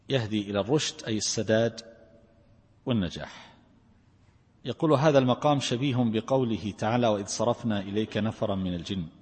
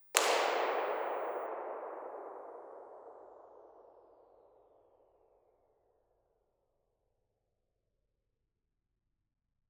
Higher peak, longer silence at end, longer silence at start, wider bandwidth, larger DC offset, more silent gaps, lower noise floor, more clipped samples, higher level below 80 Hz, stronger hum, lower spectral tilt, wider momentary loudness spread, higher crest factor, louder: second, -8 dBFS vs -2 dBFS; second, 0.1 s vs 5.7 s; about the same, 0.1 s vs 0 s; second, 8.8 kHz vs over 20 kHz; neither; neither; second, -61 dBFS vs -85 dBFS; neither; first, -58 dBFS vs -88 dBFS; neither; first, -5.5 dB/octave vs 1.5 dB/octave; second, 11 LU vs 26 LU; second, 20 dB vs 40 dB; first, -27 LUFS vs -35 LUFS